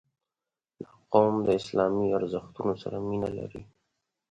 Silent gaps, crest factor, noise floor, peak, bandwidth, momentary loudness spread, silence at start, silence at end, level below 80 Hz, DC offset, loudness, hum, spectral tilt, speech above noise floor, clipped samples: none; 24 dB; under -90 dBFS; -6 dBFS; 9 kHz; 23 LU; 0.8 s; 0.65 s; -60 dBFS; under 0.1%; -28 LUFS; none; -7.5 dB/octave; over 63 dB; under 0.1%